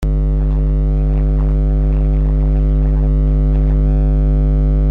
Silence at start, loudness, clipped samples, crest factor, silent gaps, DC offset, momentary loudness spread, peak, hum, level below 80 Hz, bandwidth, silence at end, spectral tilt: 0 s; -16 LUFS; under 0.1%; 6 dB; none; under 0.1%; 2 LU; -6 dBFS; 50 Hz at -10 dBFS; -14 dBFS; 2.5 kHz; 0 s; -11 dB/octave